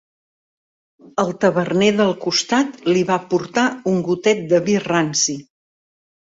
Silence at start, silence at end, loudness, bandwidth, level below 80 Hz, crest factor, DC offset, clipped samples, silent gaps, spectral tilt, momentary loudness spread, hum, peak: 1.15 s; 0.85 s; -18 LUFS; 8 kHz; -60 dBFS; 18 dB; under 0.1%; under 0.1%; none; -4 dB/octave; 4 LU; none; -2 dBFS